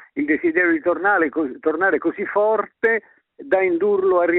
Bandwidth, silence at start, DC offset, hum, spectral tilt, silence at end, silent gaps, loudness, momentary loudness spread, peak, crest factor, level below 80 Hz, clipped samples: 4.1 kHz; 0.15 s; under 0.1%; none; -4.5 dB/octave; 0 s; none; -19 LUFS; 5 LU; -6 dBFS; 14 dB; -64 dBFS; under 0.1%